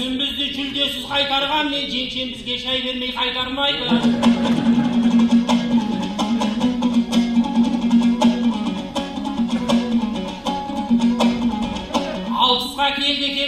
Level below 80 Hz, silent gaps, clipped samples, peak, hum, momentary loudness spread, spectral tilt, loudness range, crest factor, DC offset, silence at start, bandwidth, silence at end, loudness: -44 dBFS; none; under 0.1%; -4 dBFS; none; 8 LU; -4.5 dB/octave; 3 LU; 16 dB; under 0.1%; 0 s; 13 kHz; 0 s; -19 LUFS